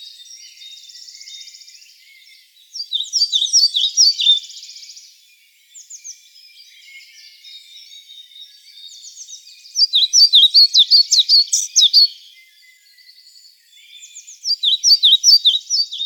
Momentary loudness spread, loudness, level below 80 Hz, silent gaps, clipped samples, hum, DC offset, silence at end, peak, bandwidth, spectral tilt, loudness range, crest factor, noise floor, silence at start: 26 LU; -11 LUFS; under -90 dBFS; none; under 0.1%; none; under 0.1%; 0 s; -2 dBFS; 18 kHz; 12.5 dB/octave; 12 LU; 16 dB; -52 dBFS; 0 s